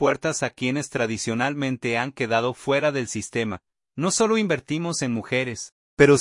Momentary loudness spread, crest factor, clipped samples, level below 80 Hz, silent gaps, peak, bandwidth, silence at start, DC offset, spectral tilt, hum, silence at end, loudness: 8 LU; 22 dB; under 0.1%; -58 dBFS; 5.72-5.97 s; -2 dBFS; 11.5 kHz; 0 s; under 0.1%; -4.5 dB/octave; none; 0 s; -24 LUFS